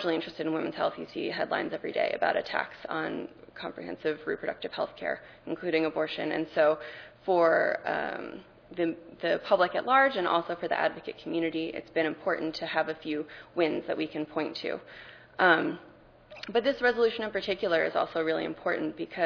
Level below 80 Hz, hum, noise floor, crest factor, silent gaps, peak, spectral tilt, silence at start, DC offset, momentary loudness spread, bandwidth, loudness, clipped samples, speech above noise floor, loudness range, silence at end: -66 dBFS; none; -52 dBFS; 22 dB; none; -8 dBFS; -6 dB/octave; 0 s; under 0.1%; 14 LU; 5.4 kHz; -29 LUFS; under 0.1%; 23 dB; 5 LU; 0 s